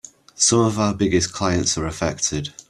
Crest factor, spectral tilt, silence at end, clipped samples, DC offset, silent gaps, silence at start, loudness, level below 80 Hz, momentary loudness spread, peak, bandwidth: 16 dB; -3.5 dB/octave; 0.1 s; under 0.1%; under 0.1%; none; 0.4 s; -20 LUFS; -44 dBFS; 7 LU; -4 dBFS; 12.5 kHz